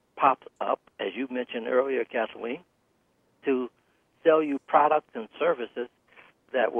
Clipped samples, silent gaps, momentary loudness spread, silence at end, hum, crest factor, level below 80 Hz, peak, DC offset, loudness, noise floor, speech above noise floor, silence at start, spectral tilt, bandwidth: under 0.1%; none; 13 LU; 0 s; none; 20 dB; -80 dBFS; -8 dBFS; under 0.1%; -27 LUFS; -70 dBFS; 43 dB; 0.15 s; -7 dB/octave; 3.6 kHz